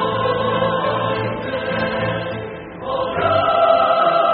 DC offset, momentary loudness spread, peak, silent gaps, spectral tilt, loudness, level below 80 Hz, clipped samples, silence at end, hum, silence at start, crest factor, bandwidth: under 0.1%; 11 LU; -4 dBFS; none; -3.5 dB/octave; -18 LUFS; -48 dBFS; under 0.1%; 0 s; none; 0 s; 14 dB; 4.8 kHz